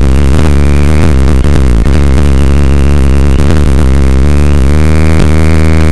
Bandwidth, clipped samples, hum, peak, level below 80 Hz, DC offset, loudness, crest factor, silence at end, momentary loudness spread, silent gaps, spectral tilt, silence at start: 11 kHz; 3%; none; 0 dBFS; -8 dBFS; 40%; -8 LUFS; 8 dB; 0 s; 1 LU; none; -7 dB/octave; 0 s